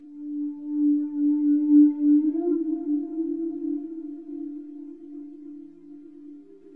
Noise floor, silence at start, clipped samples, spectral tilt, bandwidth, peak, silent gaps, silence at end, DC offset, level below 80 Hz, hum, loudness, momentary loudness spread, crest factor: -46 dBFS; 0 s; under 0.1%; -11 dB/octave; 1.5 kHz; -8 dBFS; none; 0 s; 0.1%; -80 dBFS; none; -23 LUFS; 24 LU; 16 dB